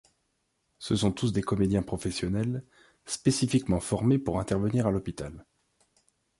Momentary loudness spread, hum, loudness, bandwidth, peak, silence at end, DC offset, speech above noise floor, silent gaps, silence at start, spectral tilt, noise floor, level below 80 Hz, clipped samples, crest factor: 11 LU; none; -28 LUFS; 11.5 kHz; -10 dBFS; 0.95 s; under 0.1%; 48 dB; none; 0.8 s; -6 dB/octave; -76 dBFS; -48 dBFS; under 0.1%; 18 dB